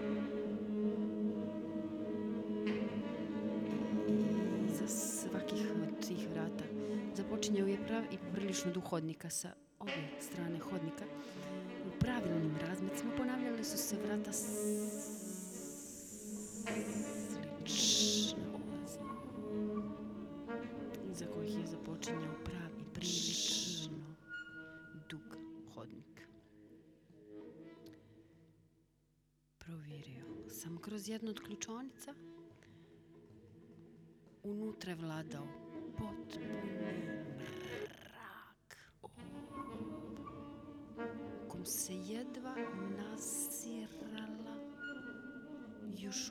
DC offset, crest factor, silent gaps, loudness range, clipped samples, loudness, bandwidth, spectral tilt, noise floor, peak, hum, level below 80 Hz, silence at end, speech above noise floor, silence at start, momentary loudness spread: under 0.1%; 22 dB; none; 15 LU; under 0.1%; -41 LUFS; 19.5 kHz; -4 dB/octave; -76 dBFS; -20 dBFS; none; -68 dBFS; 0 s; 35 dB; 0 s; 16 LU